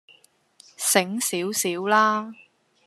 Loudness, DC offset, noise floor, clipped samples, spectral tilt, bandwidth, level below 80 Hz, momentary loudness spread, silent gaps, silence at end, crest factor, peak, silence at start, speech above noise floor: -22 LUFS; under 0.1%; -58 dBFS; under 0.1%; -2.5 dB/octave; 14 kHz; -82 dBFS; 8 LU; none; 0.5 s; 24 dB; -2 dBFS; 0.8 s; 35 dB